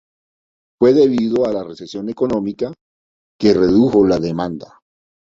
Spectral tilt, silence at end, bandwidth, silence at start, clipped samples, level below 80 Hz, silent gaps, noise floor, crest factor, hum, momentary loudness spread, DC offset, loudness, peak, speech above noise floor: -7.5 dB/octave; 0.75 s; 7.6 kHz; 0.8 s; under 0.1%; -48 dBFS; 2.81-3.39 s; under -90 dBFS; 16 dB; none; 14 LU; under 0.1%; -16 LUFS; -2 dBFS; over 75 dB